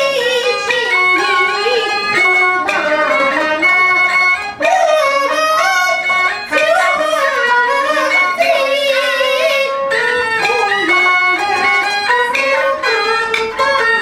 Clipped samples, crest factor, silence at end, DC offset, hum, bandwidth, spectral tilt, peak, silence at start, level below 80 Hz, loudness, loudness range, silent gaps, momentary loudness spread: under 0.1%; 14 dB; 0 s; under 0.1%; none; 18.5 kHz; -1.5 dB/octave; 0 dBFS; 0 s; -54 dBFS; -12 LUFS; 1 LU; none; 4 LU